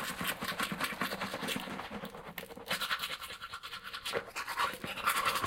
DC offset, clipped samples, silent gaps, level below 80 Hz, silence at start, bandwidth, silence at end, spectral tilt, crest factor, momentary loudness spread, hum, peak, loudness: under 0.1%; under 0.1%; none; -64 dBFS; 0 s; 17 kHz; 0 s; -2 dB/octave; 20 dB; 10 LU; none; -16 dBFS; -36 LUFS